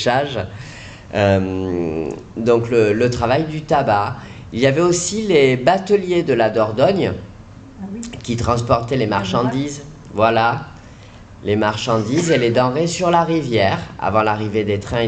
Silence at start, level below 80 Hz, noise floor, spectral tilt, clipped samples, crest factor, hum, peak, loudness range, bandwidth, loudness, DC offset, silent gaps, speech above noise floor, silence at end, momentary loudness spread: 0 s; -44 dBFS; -39 dBFS; -5.5 dB/octave; under 0.1%; 14 dB; none; -2 dBFS; 3 LU; 9.2 kHz; -17 LUFS; under 0.1%; none; 23 dB; 0 s; 14 LU